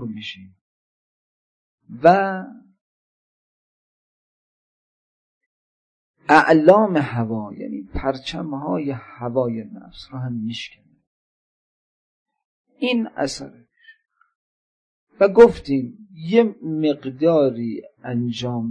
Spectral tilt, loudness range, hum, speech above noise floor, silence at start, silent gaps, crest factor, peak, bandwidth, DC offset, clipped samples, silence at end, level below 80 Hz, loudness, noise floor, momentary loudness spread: -6.5 dB/octave; 11 LU; none; over 71 dB; 0 s; 0.61-1.78 s, 2.81-6.14 s, 11.07-12.26 s, 12.45-12.65 s, 14.35-15.07 s; 22 dB; -2 dBFS; 10 kHz; under 0.1%; under 0.1%; 0 s; -48 dBFS; -19 LUFS; under -90 dBFS; 20 LU